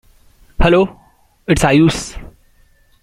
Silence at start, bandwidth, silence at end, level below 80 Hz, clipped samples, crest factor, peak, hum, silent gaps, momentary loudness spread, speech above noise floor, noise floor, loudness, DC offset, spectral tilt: 0.6 s; 15 kHz; 0.75 s; -28 dBFS; under 0.1%; 16 dB; -2 dBFS; none; none; 19 LU; 39 dB; -51 dBFS; -14 LUFS; under 0.1%; -5.5 dB/octave